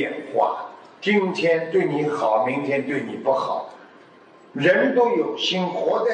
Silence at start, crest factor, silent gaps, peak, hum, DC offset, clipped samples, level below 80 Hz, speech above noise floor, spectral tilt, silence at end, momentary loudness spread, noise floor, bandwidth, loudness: 0 s; 16 dB; none; -6 dBFS; none; under 0.1%; under 0.1%; -80 dBFS; 28 dB; -5.5 dB/octave; 0 s; 9 LU; -49 dBFS; 9.2 kHz; -22 LUFS